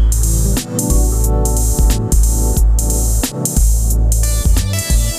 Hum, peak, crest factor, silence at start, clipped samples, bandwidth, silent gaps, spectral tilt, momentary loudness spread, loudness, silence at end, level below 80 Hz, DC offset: none; -2 dBFS; 10 dB; 0 s; under 0.1%; 16 kHz; none; -4.5 dB/octave; 2 LU; -15 LUFS; 0 s; -14 dBFS; under 0.1%